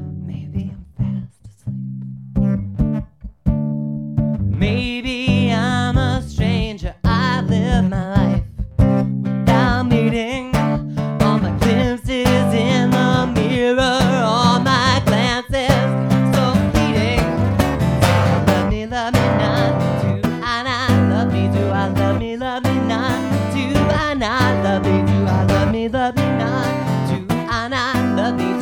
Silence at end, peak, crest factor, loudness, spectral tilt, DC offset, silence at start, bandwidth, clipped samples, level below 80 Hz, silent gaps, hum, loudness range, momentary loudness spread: 0 s; 0 dBFS; 16 dB; -18 LUFS; -6.5 dB/octave; 0.1%; 0 s; 19 kHz; under 0.1%; -30 dBFS; none; none; 4 LU; 8 LU